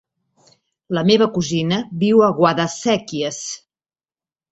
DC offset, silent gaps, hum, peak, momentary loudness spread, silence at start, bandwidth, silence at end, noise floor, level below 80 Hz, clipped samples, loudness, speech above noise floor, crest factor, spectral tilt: under 0.1%; none; none; 0 dBFS; 11 LU; 0.9 s; 8.2 kHz; 0.95 s; under -90 dBFS; -58 dBFS; under 0.1%; -18 LUFS; over 73 dB; 18 dB; -5 dB/octave